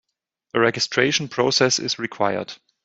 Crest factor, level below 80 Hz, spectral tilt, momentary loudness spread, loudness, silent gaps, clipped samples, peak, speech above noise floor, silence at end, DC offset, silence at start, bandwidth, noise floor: 20 dB; -64 dBFS; -3 dB/octave; 9 LU; -20 LUFS; none; under 0.1%; -2 dBFS; 57 dB; 0.3 s; under 0.1%; 0.55 s; 8.2 kHz; -78 dBFS